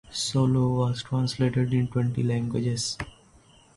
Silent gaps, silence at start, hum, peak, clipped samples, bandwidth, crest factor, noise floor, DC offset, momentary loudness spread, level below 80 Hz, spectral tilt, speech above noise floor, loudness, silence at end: none; 0.1 s; none; -12 dBFS; under 0.1%; 11.5 kHz; 14 dB; -56 dBFS; under 0.1%; 6 LU; -52 dBFS; -6 dB/octave; 31 dB; -26 LUFS; 0.65 s